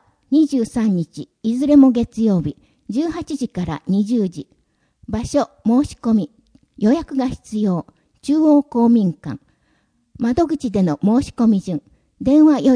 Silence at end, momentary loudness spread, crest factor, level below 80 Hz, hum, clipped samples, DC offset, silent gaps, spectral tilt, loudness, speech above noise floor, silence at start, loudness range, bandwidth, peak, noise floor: 0 s; 13 LU; 16 dB; -46 dBFS; none; under 0.1%; under 0.1%; none; -7.5 dB/octave; -18 LUFS; 46 dB; 0.3 s; 4 LU; 10.5 kHz; -2 dBFS; -63 dBFS